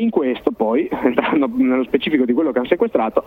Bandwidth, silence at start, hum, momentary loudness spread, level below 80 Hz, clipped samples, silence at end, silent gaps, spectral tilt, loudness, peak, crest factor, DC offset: 4.3 kHz; 0 s; none; 2 LU; -52 dBFS; under 0.1%; 0.05 s; none; -8 dB/octave; -18 LUFS; -2 dBFS; 16 dB; under 0.1%